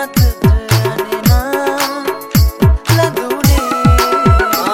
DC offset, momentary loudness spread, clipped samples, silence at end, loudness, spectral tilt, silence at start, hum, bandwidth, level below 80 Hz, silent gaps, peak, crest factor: under 0.1%; 5 LU; under 0.1%; 0 s; -13 LUFS; -5.5 dB/octave; 0 s; none; 17 kHz; -18 dBFS; none; 0 dBFS; 12 dB